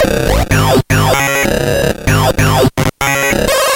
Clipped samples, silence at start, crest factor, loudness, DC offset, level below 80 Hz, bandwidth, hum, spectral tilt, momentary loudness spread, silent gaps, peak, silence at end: under 0.1%; 0 s; 12 dB; -12 LUFS; under 0.1%; -24 dBFS; 17.5 kHz; none; -4.5 dB/octave; 3 LU; none; 0 dBFS; 0 s